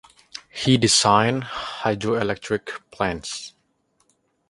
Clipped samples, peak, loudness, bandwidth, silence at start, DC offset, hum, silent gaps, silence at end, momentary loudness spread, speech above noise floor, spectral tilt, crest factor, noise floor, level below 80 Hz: under 0.1%; -2 dBFS; -21 LUFS; 11.5 kHz; 0.35 s; under 0.1%; none; none; 1 s; 20 LU; 46 dB; -3.5 dB/octave; 22 dB; -67 dBFS; -52 dBFS